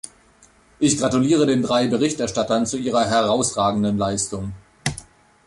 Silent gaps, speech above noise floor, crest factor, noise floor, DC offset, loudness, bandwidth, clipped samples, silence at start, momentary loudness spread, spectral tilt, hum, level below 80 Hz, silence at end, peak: none; 34 dB; 16 dB; -54 dBFS; under 0.1%; -20 LUFS; 11.5 kHz; under 0.1%; 0.05 s; 10 LU; -4.5 dB/octave; none; -48 dBFS; 0.45 s; -6 dBFS